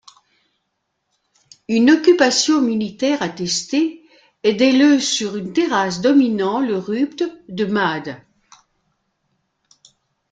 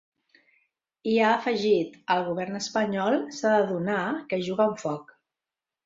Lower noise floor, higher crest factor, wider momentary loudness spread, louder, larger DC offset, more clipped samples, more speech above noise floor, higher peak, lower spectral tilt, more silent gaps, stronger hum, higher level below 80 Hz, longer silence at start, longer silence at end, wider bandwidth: second, -73 dBFS vs -90 dBFS; about the same, 18 dB vs 18 dB; first, 10 LU vs 7 LU; first, -17 LUFS vs -26 LUFS; neither; neither; second, 57 dB vs 64 dB; first, -2 dBFS vs -8 dBFS; second, -3.5 dB/octave vs -5 dB/octave; neither; neither; first, -62 dBFS vs -70 dBFS; first, 1.7 s vs 1.05 s; first, 2.15 s vs 0.85 s; first, 9.4 kHz vs 7.8 kHz